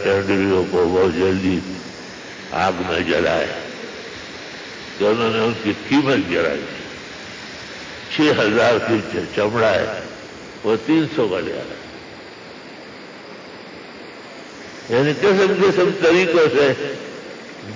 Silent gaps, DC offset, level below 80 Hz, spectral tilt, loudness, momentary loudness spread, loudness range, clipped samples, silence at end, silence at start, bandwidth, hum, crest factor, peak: none; under 0.1%; -48 dBFS; -5.5 dB/octave; -18 LUFS; 21 LU; 7 LU; under 0.1%; 0 s; 0 s; 7.6 kHz; none; 14 dB; -6 dBFS